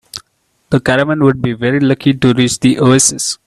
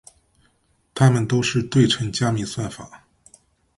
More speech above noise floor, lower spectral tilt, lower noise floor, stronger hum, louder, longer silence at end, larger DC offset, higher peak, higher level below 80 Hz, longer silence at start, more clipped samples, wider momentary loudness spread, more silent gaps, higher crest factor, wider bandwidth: first, 49 dB vs 45 dB; about the same, -4.5 dB/octave vs -5.5 dB/octave; about the same, -61 dBFS vs -64 dBFS; neither; first, -12 LUFS vs -20 LUFS; second, 0.1 s vs 0.8 s; neither; about the same, 0 dBFS vs -2 dBFS; first, -44 dBFS vs -52 dBFS; second, 0.15 s vs 0.95 s; neither; second, 7 LU vs 14 LU; neither; second, 12 dB vs 20 dB; first, 13.5 kHz vs 11.5 kHz